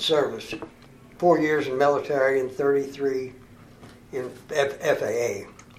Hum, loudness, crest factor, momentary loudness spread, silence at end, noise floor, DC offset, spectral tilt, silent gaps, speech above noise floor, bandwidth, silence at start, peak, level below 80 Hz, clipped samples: none; -24 LUFS; 18 dB; 14 LU; 0.25 s; -48 dBFS; under 0.1%; -4.5 dB/octave; none; 24 dB; 15 kHz; 0 s; -6 dBFS; -60 dBFS; under 0.1%